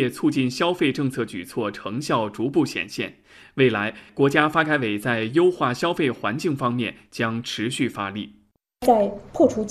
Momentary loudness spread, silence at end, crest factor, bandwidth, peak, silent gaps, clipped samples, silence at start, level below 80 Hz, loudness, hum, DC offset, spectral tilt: 10 LU; 0 s; 20 dB; 14 kHz; -2 dBFS; none; under 0.1%; 0 s; -58 dBFS; -23 LUFS; none; under 0.1%; -5.5 dB/octave